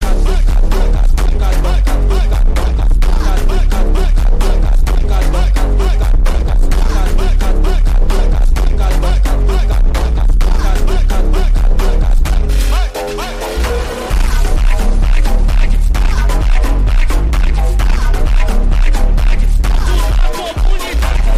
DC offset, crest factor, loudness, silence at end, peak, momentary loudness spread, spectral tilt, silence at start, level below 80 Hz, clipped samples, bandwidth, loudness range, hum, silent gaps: under 0.1%; 8 dB; -15 LUFS; 0 s; 0 dBFS; 2 LU; -5.5 dB/octave; 0 s; -10 dBFS; under 0.1%; 13 kHz; 1 LU; none; none